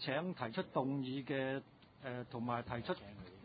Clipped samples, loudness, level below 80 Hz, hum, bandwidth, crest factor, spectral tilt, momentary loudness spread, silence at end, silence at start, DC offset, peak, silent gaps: under 0.1%; -42 LUFS; -68 dBFS; none; 4.8 kHz; 20 dB; -4.5 dB/octave; 8 LU; 0 s; 0 s; under 0.1%; -22 dBFS; none